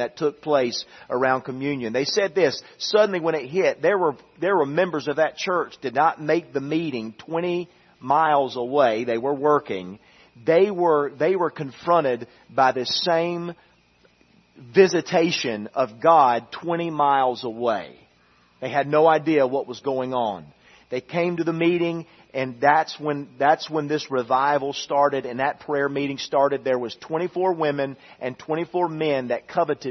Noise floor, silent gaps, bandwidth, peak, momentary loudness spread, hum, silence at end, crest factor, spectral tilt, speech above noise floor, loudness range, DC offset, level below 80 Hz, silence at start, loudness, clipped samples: -59 dBFS; none; 6.4 kHz; -2 dBFS; 11 LU; none; 0 s; 20 dB; -5 dB/octave; 37 dB; 3 LU; under 0.1%; -68 dBFS; 0 s; -22 LUFS; under 0.1%